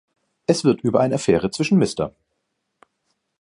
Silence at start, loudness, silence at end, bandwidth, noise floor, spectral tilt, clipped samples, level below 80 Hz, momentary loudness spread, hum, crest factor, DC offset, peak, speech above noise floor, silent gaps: 0.5 s; -20 LUFS; 1.35 s; 11.5 kHz; -75 dBFS; -6 dB/octave; under 0.1%; -52 dBFS; 9 LU; none; 20 dB; under 0.1%; -2 dBFS; 56 dB; none